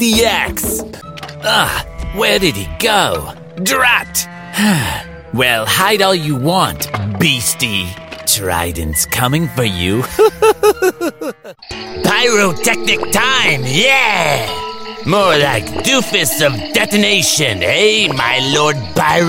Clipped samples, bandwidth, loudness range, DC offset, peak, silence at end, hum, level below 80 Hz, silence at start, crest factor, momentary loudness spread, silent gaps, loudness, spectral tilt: under 0.1%; 17 kHz; 3 LU; under 0.1%; 0 dBFS; 0 s; none; -36 dBFS; 0 s; 14 dB; 11 LU; none; -13 LUFS; -3 dB/octave